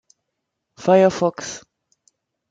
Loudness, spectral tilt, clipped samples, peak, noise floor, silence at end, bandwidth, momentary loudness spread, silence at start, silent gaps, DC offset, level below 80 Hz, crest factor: -18 LUFS; -5.5 dB/octave; under 0.1%; -4 dBFS; -78 dBFS; 0.95 s; 7.8 kHz; 17 LU; 0.8 s; none; under 0.1%; -64 dBFS; 18 dB